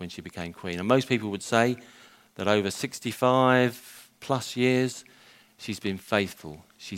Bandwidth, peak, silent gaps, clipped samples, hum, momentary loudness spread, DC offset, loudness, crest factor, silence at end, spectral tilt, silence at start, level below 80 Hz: 16 kHz; -4 dBFS; none; under 0.1%; none; 20 LU; under 0.1%; -26 LUFS; 22 dB; 0 s; -5 dB/octave; 0 s; -66 dBFS